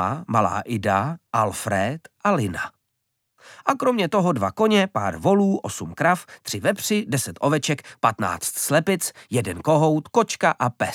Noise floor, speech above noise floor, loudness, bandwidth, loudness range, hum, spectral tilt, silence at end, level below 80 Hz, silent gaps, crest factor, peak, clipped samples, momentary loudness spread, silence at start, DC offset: -76 dBFS; 54 dB; -22 LUFS; 18 kHz; 3 LU; none; -5 dB/octave; 0 s; -58 dBFS; none; 20 dB; -2 dBFS; under 0.1%; 7 LU; 0 s; under 0.1%